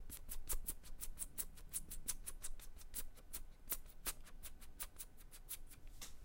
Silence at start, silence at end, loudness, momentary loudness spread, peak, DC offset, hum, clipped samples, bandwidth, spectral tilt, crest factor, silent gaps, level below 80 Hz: 0 s; 0 s; -49 LUFS; 11 LU; -26 dBFS; under 0.1%; none; under 0.1%; 17 kHz; -1.5 dB/octave; 22 dB; none; -52 dBFS